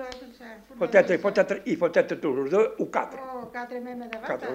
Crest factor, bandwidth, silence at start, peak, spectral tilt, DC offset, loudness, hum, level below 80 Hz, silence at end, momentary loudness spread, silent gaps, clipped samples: 20 dB; 15.5 kHz; 0 s; -6 dBFS; -6 dB/octave; under 0.1%; -26 LUFS; none; -64 dBFS; 0 s; 18 LU; none; under 0.1%